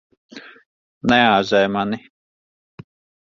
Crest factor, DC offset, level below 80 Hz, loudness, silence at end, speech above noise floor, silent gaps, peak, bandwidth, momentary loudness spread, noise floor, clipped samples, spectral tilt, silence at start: 22 dB; under 0.1%; -52 dBFS; -17 LUFS; 1.25 s; over 73 dB; 0.66-1.01 s; 0 dBFS; 7.6 kHz; 26 LU; under -90 dBFS; under 0.1%; -5.5 dB/octave; 0.35 s